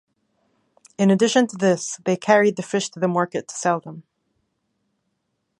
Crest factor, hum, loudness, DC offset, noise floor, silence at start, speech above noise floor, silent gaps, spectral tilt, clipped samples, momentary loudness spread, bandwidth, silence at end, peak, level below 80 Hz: 20 dB; none; -20 LUFS; under 0.1%; -75 dBFS; 1 s; 54 dB; none; -5 dB/octave; under 0.1%; 8 LU; 11 kHz; 1.6 s; -2 dBFS; -72 dBFS